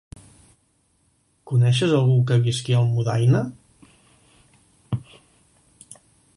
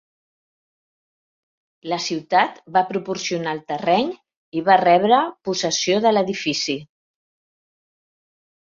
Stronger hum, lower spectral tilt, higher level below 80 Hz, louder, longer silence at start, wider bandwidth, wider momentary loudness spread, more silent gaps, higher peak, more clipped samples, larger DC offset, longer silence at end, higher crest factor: neither; first, -6.5 dB/octave vs -3.5 dB/octave; first, -54 dBFS vs -68 dBFS; about the same, -21 LUFS vs -20 LUFS; second, 1.45 s vs 1.85 s; first, 11.5 kHz vs 7.6 kHz; about the same, 13 LU vs 12 LU; second, none vs 4.36-4.52 s; second, -8 dBFS vs -2 dBFS; neither; neither; second, 1.4 s vs 1.8 s; about the same, 16 dB vs 20 dB